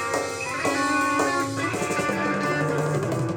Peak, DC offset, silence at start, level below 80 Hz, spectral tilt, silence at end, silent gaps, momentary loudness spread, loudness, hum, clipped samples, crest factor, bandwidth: -10 dBFS; under 0.1%; 0 s; -60 dBFS; -4.5 dB/octave; 0 s; none; 4 LU; -24 LUFS; none; under 0.1%; 16 dB; 19.5 kHz